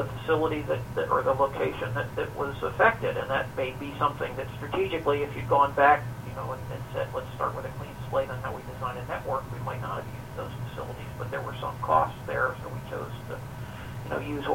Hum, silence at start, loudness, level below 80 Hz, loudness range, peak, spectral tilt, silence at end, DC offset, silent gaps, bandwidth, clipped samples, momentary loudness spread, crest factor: none; 0 s; -29 LUFS; -48 dBFS; 7 LU; -6 dBFS; -6.5 dB/octave; 0 s; under 0.1%; none; 16.5 kHz; under 0.1%; 14 LU; 22 dB